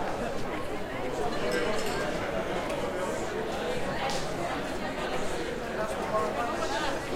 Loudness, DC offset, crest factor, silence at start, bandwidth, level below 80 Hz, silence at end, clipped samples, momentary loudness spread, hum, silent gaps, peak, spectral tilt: -32 LUFS; under 0.1%; 16 dB; 0 s; 16.5 kHz; -46 dBFS; 0 s; under 0.1%; 4 LU; none; none; -14 dBFS; -4.5 dB/octave